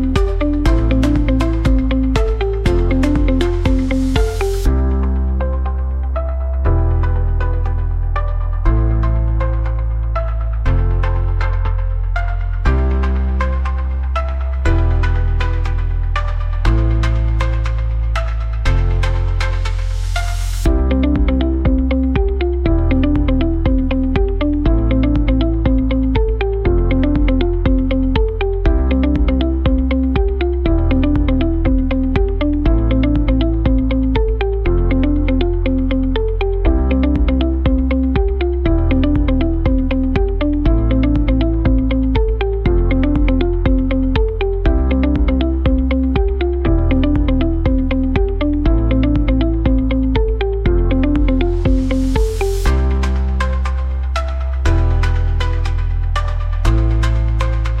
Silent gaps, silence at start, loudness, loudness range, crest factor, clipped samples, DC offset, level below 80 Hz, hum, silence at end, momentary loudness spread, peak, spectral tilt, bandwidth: none; 0 s; -17 LUFS; 3 LU; 14 dB; under 0.1%; 0.3%; -16 dBFS; none; 0 s; 5 LU; -2 dBFS; -8 dB/octave; 8.8 kHz